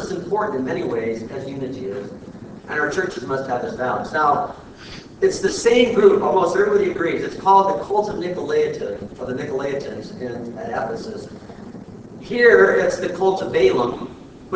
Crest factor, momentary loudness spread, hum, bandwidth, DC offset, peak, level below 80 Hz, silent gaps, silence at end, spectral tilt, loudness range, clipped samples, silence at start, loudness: 20 dB; 22 LU; none; 8 kHz; under 0.1%; 0 dBFS; -50 dBFS; none; 0 s; -5 dB/octave; 8 LU; under 0.1%; 0 s; -20 LUFS